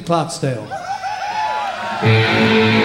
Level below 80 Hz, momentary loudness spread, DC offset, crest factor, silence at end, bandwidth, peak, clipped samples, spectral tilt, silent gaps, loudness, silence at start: -52 dBFS; 11 LU; under 0.1%; 16 dB; 0 s; 12.5 kHz; -2 dBFS; under 0.1%; -5.5 dB/octave; none; -17 LUFS; 0 s